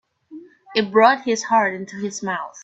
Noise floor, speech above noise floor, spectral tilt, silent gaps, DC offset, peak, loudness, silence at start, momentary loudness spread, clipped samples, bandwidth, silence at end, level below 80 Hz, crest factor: -42 dBFS; 23 dB; -3.5 dB/octave; none; under 0.1%; 0 dBFS; -19 LUFS; 0.3 s; 12 LU; under 0.1%; 8.2 kHz; 0 s; -68 dBFS; 20 dB